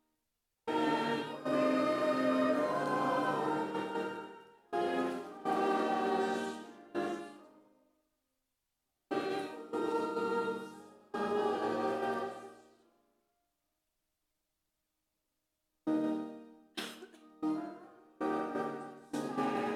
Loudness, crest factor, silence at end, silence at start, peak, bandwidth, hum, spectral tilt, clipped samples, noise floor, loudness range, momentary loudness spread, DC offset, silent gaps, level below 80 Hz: -35 LUFS; 16 dB; 0 s; 0.65 s; -20 dBFS; 15 kHz; none; -5.5 dB/octave; under 0.1%; -85 dBFS; 10 LU; 15 LU; under 0.1%; none; -82 dBFS